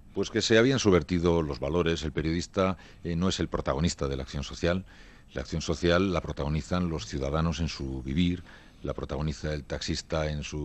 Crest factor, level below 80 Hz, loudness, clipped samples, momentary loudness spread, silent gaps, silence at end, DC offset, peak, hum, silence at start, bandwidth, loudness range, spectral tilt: 22 dB; -42 dBFS; -29 LUFS; under 0.1%; 11 LU; none; 0 s; under 0.1%; -8 dBFS; none; 0.05 s; 8.6 kHz; 5 LU; -5.5 dB/octave